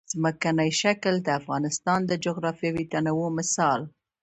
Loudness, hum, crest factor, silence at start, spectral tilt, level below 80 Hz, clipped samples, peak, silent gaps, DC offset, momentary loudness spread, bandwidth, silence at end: -26 LUFS; none; 18 dB; 0.1 s; -4.5 dB/octave; -62 dBFS; under 0.1%; -8 dBFS; none; under 0.1%; 5 LU; 9 kHz; 0.35 s